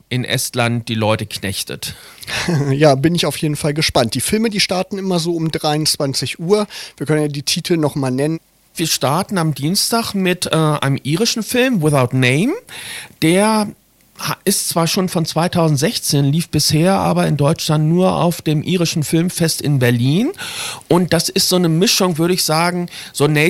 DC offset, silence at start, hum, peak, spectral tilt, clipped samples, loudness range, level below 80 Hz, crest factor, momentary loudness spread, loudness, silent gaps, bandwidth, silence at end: under 0.1%; 0.1 s; none; 0 dBFS; -4.5 dB/octave; under 0.1%; 2 LU; -48 dBFS; 16 dB; 8 LU; -16 LUFS; none; 16.5 kHz; 0 s